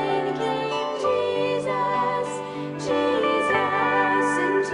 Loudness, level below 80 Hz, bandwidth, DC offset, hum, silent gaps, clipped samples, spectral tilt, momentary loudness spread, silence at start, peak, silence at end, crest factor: -23 LUFS; -62 dBFS; 11 kHz; under 0.1%; none; none; under 0.1%; -4.5 dB/octave; 6 LU; 0 s; -8 dBFS; 0 s; 16 dB